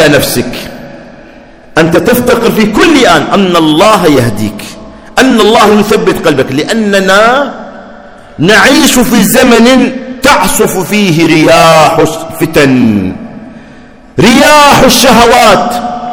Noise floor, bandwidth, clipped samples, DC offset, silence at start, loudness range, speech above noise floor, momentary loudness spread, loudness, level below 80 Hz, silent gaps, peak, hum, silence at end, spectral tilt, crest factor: -32 dBFS; over 20 kHz; 10%; under 0.1%; 0 s; 2 LU; 27 dB; 13 LU; -5 LUFS; -30 dBFS; none; 0 dBFS; none; 0 s; -4 dB/octave; 6 dB